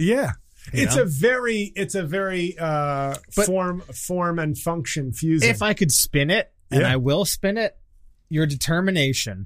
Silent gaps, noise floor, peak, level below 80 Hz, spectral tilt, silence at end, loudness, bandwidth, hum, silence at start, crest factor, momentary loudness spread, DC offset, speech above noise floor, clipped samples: none; -51 dBFS; -4 dBFS; -44 dBFS; -4.5 dB/octave; 0 s; -22 LUFS; 15.5 kHz; none; 0 s; 20 dB; 8 LU; under 0.1%; 29 dB; under 0.1%